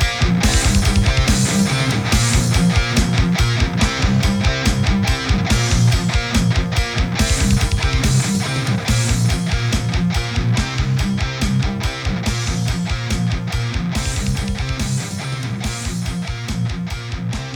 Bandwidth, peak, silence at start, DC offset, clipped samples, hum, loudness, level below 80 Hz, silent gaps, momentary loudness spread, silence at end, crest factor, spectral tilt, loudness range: 19 kHz; -4 dBFS; 0 s; under 0.1%; under 0.1%; none; -18 LUFS; -24 dBFS; none; 8 LU; 0 s; 14 dB; -4.5 dB/octave; 6 LU